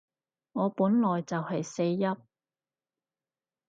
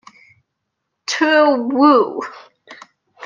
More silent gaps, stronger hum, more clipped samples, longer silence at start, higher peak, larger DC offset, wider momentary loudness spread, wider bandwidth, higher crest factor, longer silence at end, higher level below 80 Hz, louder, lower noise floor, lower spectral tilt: neither; neither; neither; second, 0.55 s vs 1.1 s; second, -14 dBFS vs -2 dBFS; neither; second, 9 LU vs 17 LU; about the same, 7.8 kHz vs 7.6 kHz; about the same, 16 dB vs 16 dB; first, 1.55 s vs 0 s; second, -78 dBFS vs -72 dBFS; second, -29 LUFS vs -14 LUFS; first, under -90 dBFS vs -76 dBFS; first, -7 dB/octave vs -3 dB/octave